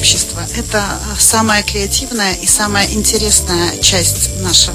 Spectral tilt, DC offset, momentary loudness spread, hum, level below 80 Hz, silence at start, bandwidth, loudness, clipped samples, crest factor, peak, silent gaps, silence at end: -2 dB/octave; under 0.1%; 7 LU; none; -26 dBFS; 0 s; over 20 kHz; -11 LUFS; 0.1%; 14 dB; 0 dBFS; none; 0 s